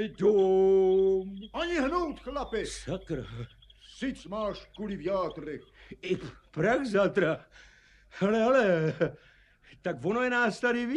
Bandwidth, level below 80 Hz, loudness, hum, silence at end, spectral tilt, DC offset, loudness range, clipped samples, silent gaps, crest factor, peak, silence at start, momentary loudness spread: 10.5 kHz; -54 dBFS; -29 LUFS; none; 0 s; -6 dB/octave; under 0.1%; 8 LU; under 0.1%; none; 16 dB; -12 dBFS; 0 s; 15 LU